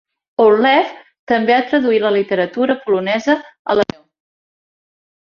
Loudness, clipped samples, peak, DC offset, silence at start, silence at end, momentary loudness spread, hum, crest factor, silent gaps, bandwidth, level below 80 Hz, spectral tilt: -15 LUFS; under 0.1%; -2 dBFS; under 0.1%; 0.4 s; 1.35 s; 7 LU; none; 16 dB; 1.19-1.27 s, 3.59-3.65 s; 7 kHz; -60 dBFS; -5.5 dB/octave